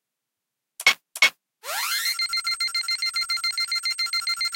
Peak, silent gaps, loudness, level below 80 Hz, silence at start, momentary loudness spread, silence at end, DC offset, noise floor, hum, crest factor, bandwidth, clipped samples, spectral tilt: -4 dBFS; none; -23 LUFS; -72 dBFS; 0.8 s; 4 LU; 0 s; under 0.1%; -84 dBFS; none; 22 dB; 17 kHz; under 0.1%; 3 dB/octave